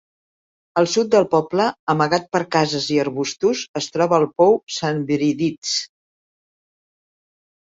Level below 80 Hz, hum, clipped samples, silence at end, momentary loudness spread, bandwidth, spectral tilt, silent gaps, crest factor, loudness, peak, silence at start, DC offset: -62 dBFS; none; under 0.1%; 1.9 s; 7 LU; 8 kHz; -4.5 dB/octave; 1.79-1.87 s, 3.69-3.74 s, 4.63-4.67 s, 5.58-5.62 s; 18 dB; -19 LUFS; -2 dBFS; 0.75 s; under 0.1%